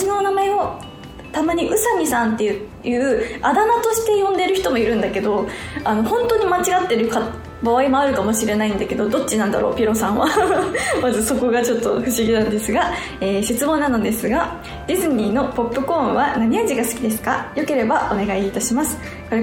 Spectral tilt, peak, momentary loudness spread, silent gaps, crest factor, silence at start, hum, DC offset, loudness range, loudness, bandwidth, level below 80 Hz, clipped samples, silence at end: -4 dB/octave; -4 dBFS; 6 LU; none; 16 dB; 0 s; none; under 0.1%; 2 LU; -19 LUFS; 19.5 kHz; -42 dBFS; under 0.1%; 0 s